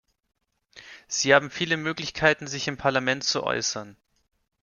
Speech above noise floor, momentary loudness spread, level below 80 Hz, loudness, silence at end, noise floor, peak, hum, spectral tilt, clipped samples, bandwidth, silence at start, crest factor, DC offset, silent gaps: 28 dB; 10 LU; -60 dBFS; -24 LUFS; 0.7 s; -53 dBFS; -2 dBFS; none; -3 dB/octave; under 0.1%; 10 kHz; 0.75 s; 24 dB; under 0.1%; none